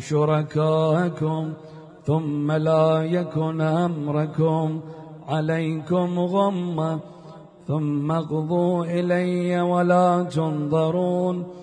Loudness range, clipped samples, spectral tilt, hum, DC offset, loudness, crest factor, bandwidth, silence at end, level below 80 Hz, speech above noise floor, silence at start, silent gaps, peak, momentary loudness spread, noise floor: 3 LU; under 0.1%; -8 dB/octave; none; under 0.1%; -23 LUFS; 14 dB; 9.8 kHz; 0 s; -64 dBFS; 22 dB; 0 s; none; -8 dBFS; 10 LU; -44 dBFS